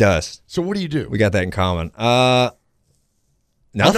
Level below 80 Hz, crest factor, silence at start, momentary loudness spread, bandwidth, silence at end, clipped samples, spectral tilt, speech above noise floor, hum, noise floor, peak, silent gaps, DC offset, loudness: -42 dBFS; 20 dB; 0 s; 9 LU; 14.5 kHz; 0 s; under 0.1%; -5.5 dB/octave; 47 dB; none; -65 dBFS; 0 dBFS; none; under 0.1%; -19 LUFS